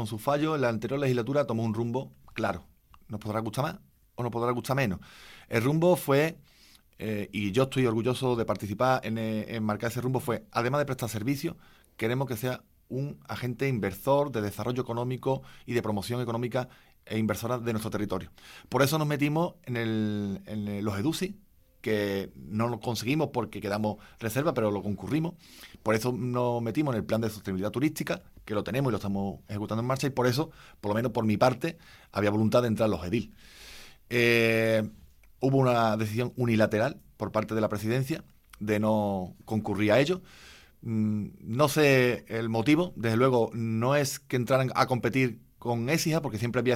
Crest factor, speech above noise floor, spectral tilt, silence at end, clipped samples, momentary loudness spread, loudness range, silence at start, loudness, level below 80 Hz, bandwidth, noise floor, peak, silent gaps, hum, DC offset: 22 dB; 30 dB; -6 dB/octave; 0 s; under 0.1%; 11 LU; 5 LU; 0 s; -29 LUFS; -60 dBFS; 16.5 kHz; -58 dBFS; -6 dBFS; none; none; under 0.1%